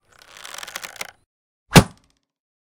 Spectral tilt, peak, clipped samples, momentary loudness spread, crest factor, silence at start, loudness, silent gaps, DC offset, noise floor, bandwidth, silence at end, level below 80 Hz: -4.5 dB/octave; 0 dBFS; under 0.1%; 21 LU; 22 dB; 0.85 s; -16 LUFS; 1.26-1.66 s; under 0.1%; -57 dBFS; 19 kHz; 0.85 s; -38 dBFS